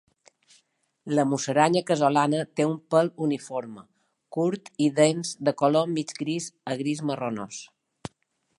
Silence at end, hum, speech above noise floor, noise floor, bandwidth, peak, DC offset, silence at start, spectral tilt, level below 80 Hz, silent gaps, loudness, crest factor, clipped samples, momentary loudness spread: 0.95 s; none; 48 dB; -73 dBFS; 11.5 kHz; -4 dBFS; under 0.1%; 1.05 s; -5.5 dB/octave; -70 dBFS; none; -25 LUFS; 22 dB; under 0.1%; 17 LU